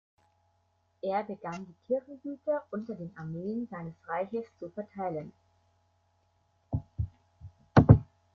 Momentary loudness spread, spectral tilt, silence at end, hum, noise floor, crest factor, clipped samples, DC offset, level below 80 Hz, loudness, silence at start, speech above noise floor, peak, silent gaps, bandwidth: 18 LU; -9.5 dB/octave; 0.3 s; none; -73 dBFS; 28 dB; under 0.1%; under 0.1%; -48 dBFS; -31 LUFS; 1.05 s; 37 dB; -4 dBFS; none; 6.6 kHz